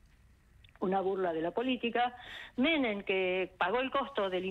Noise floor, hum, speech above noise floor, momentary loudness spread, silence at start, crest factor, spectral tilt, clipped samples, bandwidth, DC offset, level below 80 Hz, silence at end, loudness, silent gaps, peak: -62 dBFS; none; 30 dB; 5 LU; 0.8 s; 16 dB; -6.5 dB/octave; under 0.1%; 8 kHz; under 0.1%; -64 dBFS; 0 s; -32 LUFS; none; -18 dBFS